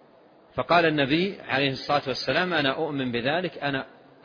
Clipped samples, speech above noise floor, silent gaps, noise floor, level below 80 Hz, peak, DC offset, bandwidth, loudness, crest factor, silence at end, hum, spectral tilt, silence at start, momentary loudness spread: under 0.1%; 30 dB; none; -55 dBFS; -60 dBFS; -8 dBFS; under 0.1%; 5.4 kHz; -25 LUFS; 18 dB; 0.35 s; none; -6 dB/octave; 0.55 s; 10 LU